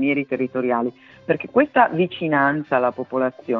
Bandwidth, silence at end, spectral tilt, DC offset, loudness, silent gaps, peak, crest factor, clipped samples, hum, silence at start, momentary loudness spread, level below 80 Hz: 4.9 kHz; 0 s; -9 dB/octave; under 0.1%; -21 LUFS; none; -2 dBFS; 18 dB; under 0.1%; none; 0 s; 7 LU; -64 dBFS